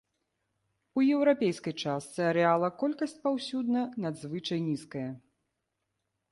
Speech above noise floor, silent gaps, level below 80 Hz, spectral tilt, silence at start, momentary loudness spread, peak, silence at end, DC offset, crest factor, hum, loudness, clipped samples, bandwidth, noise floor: 53 dB; none; -74 dBFS; -6 dB/octave; 0.95 s; 11 LU; -12 dBFS; 1.15 s; under 0.1%; 20 dB; none; -30 LUFS; under 0.1%; 11.5 kHz; -83 dBFS